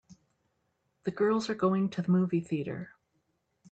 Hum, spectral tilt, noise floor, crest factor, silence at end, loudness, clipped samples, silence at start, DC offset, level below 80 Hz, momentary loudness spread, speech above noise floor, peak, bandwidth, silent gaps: none; -7.5 dB/octave; -77 dBFS; 16 dB; 0.8 s; -30 LUFS; under 0.1%; 0.1 s; under 0.1%; -72 dBFS; 11 LU; 48 dB; -16 dBFS; 8.2 kHz; none